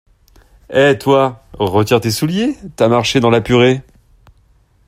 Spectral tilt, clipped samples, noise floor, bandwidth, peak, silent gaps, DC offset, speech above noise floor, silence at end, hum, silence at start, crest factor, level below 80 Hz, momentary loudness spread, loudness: -5.5 dB/octave; under 0.1%; -52 dBFS; 16 kHz; 0 dBFS; none; under 0.1%; 39 dB; 1.05 s; none; 0.7 s; 14 dB; -44 dBFS; 7 LU; -14 LUFS